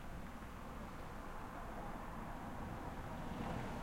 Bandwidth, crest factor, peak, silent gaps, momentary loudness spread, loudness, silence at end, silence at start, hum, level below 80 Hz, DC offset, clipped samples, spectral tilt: 16.5 kHz; 16 dB; -30 dBFS; none; 6 LU; -49 LUFS; 0 s; 0 s; none; -52 dBFS; under 0.1%; under 0.1%; -6 dB/octave